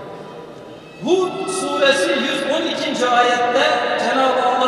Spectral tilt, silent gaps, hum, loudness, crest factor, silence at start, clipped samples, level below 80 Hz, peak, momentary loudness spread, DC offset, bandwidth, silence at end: -2.5 dB/octave; none; none; -17 LUFS; 16 dB; 0 s; under 0.1%; -64 dBFS; -2 dBFS; 20 LU; under 0.1%; 13 kHz; 0 s